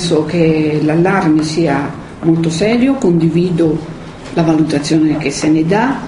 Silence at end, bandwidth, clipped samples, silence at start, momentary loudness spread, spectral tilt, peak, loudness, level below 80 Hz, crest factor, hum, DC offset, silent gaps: 0 s; 11 kHz; under 0.1%; 0 s; 6 LU; -6.5 dB/octave; 0 dBFS; -13 LUFS; -40 dBFS; 12 dB; none; under 0.1%; none